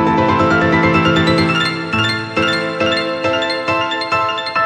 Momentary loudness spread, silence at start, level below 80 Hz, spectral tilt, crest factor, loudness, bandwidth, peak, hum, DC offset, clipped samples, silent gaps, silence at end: 4 LU; 0 s; -44 dBFS; -5.5 dB/octave; 14 dB; -15 LUFS; 11.5 kHz; -2 dBFS; none; under 0.1%; under 0.1%; none; 0 s